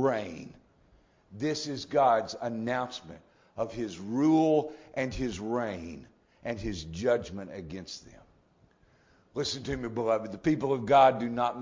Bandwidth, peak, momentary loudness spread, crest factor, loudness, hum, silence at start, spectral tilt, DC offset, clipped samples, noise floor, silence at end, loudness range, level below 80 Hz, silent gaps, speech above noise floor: 7.6 kHz; -10 dBFS; 18 LU; 20 dB; -29 LUFS; none; 0 s; -5.5 dB/octave; under 0.1%; under 0.1%; -64 dBFS; 0 s; 7 LU; -54 dBFS; none; 35 dB